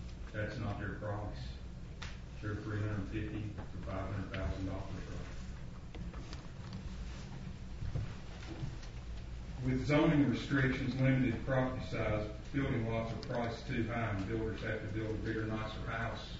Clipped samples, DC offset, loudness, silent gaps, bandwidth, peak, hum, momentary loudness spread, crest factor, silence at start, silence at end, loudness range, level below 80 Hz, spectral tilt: under 0.1%; under 0.1%; -38 LUFS; none; 7.6 kHz; -18 dBFS; none; 15 LU; 18 dB; 0 s; 0 s; 12 LU; -46 dBFS; -6 dB/octave